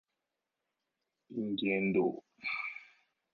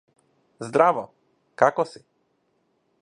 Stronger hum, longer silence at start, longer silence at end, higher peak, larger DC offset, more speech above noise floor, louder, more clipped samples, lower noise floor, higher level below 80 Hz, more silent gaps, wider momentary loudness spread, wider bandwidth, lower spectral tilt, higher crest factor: neither; first, 1.3 s vs 0.6 s; second, 0.5 s vs 1.15 s; second, -20 dBFS vs -2 dBFS; neither; first, 54 dB vs 48 dB; second, -35 LUFS vs -22 LUFS; neither; first, -88 dBFS vs -70 dBFS; about the same, -78 dBFS vs -74 dBFS; neither; second, 12 LU vs 17 LU; second, 5.2 kHz vs 11 kHz; about the same, -4.5 dB/octave vs -5.5 dB/octave; second, 18 dB vs 24 dB